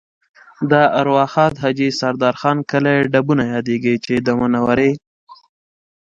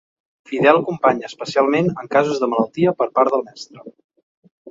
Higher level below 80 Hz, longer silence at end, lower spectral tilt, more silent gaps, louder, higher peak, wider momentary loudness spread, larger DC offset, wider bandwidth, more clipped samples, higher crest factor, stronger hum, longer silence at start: first, -52 dBFS vs -64 dBFS; first, 0.7 s vs 0 s; about the same, -6.5 dB/octave vs -6 dB/octave; second, 5.07-5.27 s vs 4.04-4.09 s, 4.23-4.43 s, 4.51-4.65 s; about the same, -16 LUFS vs -18 LUFS; about the same, 0 dBFS vs 0 dBFS; second, 5 LU vs 12 LU; neither; about the same, 7.8 kHz vs 7.8 kHz; neither; about the same, 16 dB vs 18 dB; neither; about the same, 0.6 s vs 0.5 s